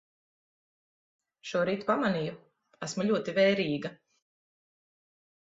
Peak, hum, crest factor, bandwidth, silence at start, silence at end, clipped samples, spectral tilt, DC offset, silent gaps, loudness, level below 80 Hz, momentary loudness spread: -12 dBFS; none; 20 dB; 8 kHz; 1.45 s; 1.55 s; under 0.1%; -5.5 dB/octave; under 0.1%; none; -29 LUFS; -74 dBFS; 14 LU